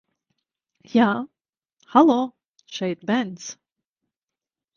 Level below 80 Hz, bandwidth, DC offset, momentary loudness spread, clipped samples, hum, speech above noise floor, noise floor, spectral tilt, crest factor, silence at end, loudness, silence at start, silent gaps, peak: -72 dBFS; 7.2 kHz; under 0.1%; 20 LU; under 0.1%; none; 69 dB; -90 dBFS; -5.5 dB/octave; 22 dB; 1.25 s; -22 LUFS; 0.95 s; 1.73-1.77 s, 2.45-2.54 s; -2 dBFS